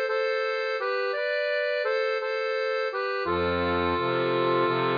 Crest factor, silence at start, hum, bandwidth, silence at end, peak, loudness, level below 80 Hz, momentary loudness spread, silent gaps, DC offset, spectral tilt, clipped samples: 12 dB; 0 s; none; 5.2 kHz; 0 s; -14 dBFS; -26 LUFS; -56 dBFS; 3 LU; none; under 0.1%; -6.5 dB/octave; under 0.1%